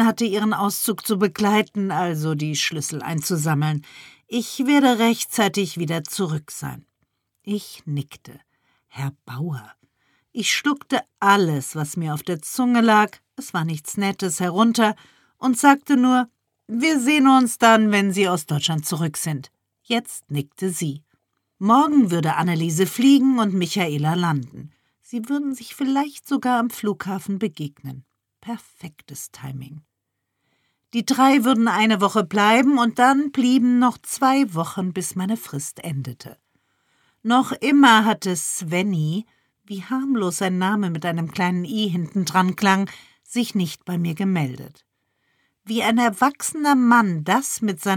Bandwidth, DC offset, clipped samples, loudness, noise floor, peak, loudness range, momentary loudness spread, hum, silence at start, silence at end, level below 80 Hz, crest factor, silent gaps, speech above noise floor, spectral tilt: 18.5 kHz; under 0.1%; under 0.1%; -20 LUFS; -78 dBFS; -2 dBFS; 9 LU; 15 LU; none; 0 s; 0 s; -68 dBFS; 20 dB; none; 58 dB; -4.5 dB/octave